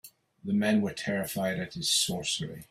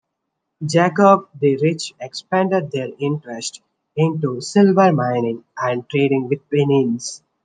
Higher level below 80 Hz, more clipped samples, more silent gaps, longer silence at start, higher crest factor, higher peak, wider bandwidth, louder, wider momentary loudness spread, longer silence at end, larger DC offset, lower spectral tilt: about the same, -64 dBFS vs -68 dBFS; neither; neither; second, 0.05 s vs 0.6 s; about the same, 16 dB vs 16 dB; second, -14 dBFS vs -2 dBFS; first, 16 kHz vs 9.8 kHz; second, -29 LUFS vs -18 LUFS; second, 6 LU vs 14 LU; second, 0.05 s vs 0.25 s; neither; second, -3.5 dB/octave vs -6 dB/octave